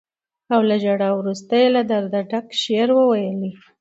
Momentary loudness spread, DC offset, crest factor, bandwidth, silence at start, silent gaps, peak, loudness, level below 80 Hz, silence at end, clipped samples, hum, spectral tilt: 8 LU; under 0.1%; 14 dB; 8 kHz; 0.5 s; none; -4 dBFS; -19 LUFS; -70 dBFS; 0.25 s; under 0.1%; none; -6 dB/octave